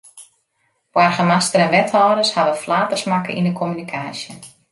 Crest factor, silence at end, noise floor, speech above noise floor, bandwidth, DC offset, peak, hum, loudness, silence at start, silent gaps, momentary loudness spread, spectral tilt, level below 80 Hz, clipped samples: 16 dB; 0.25 s; -67 dBFS; 50 dB; 11.5 kHz; under 0.1%; -2 dBFS; none; -17 LUFS; 0.15 s; none; 12 LU; -4.5 dB/octave; -64 dBFS; under 0.1%